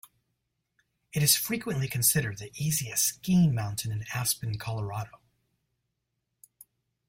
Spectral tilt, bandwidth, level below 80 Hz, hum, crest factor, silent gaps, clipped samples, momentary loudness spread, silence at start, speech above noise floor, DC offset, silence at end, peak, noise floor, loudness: -3.5 dB/octave; 16.5 kHz; -60 dBFS; none; 22 dB; none; under 0.1%; 12 LU; 1.15 s; 54 dB; under 0.1%; 2 s; -8 dBFS; -82 dBFS; -27 LUFS